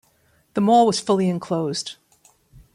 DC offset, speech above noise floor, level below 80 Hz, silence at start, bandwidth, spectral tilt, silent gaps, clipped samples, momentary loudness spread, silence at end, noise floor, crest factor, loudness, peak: under 0.1%; 42 dB; -60 dBFS; 0.55 s; 13 kHz; -5.5 dB/octave; none; under 0.1%; 13 LU; 0.8 s; -61 dBFS; 16 dB; -20 LUFS; -6 dBFS